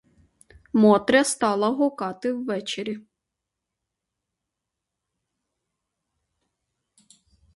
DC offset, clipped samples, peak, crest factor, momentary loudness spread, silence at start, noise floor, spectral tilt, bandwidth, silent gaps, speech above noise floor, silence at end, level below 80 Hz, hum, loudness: under 0.1%; under 0.1%; -4 dBFS; 22 dB; 13 LU; 0.75 s; -84 dBFS; -4.5 dB/octave; 11.5 kHz; none; 63 dB; 4.55 s; -64 dBFS; none; -22 LUFS